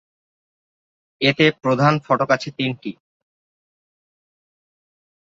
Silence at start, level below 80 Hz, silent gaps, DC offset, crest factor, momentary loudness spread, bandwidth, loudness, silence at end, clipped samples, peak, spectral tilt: 1.2 s; -62 dBFS; none; under 0.1%; 22 dB; 10 LU; 7.6 kHz; -19 LUFS; 2.4 s; under 0.1%; -2 dBFS; -6 dB/octave